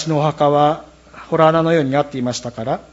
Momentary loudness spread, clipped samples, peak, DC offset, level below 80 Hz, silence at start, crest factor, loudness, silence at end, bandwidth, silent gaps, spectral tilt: 10 LU; under 0.1%; 0 dBFS; under 0.1%; -52 dBFS; 0 s; 16 dB; -17 LUFS; 0.1 s; 8 kHz; none; -6 dB/octave